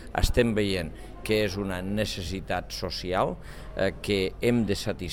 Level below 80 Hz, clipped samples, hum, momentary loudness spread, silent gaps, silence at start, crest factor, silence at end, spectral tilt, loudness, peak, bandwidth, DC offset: -38 dBFS; under 0.1%; none; 8 LU; none; 0 s; 20 dB; 0 s; -5.5 dB/octave; -28 LUFS; -8 dBFS; 17.5 kHz; 0.4%